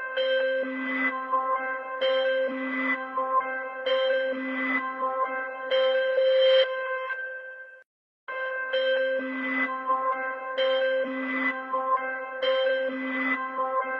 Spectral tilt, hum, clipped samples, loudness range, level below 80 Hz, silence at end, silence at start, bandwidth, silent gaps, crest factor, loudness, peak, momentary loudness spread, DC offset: -4 dB/octave; none; under 0.1%; 3 LU; -80 dBFS; 0 s; 0 s; 5.8 kHz; 7.86-8.27 s; 16 dB; -27 LUFS; -12 dBFS; 8 LU; under 0.1%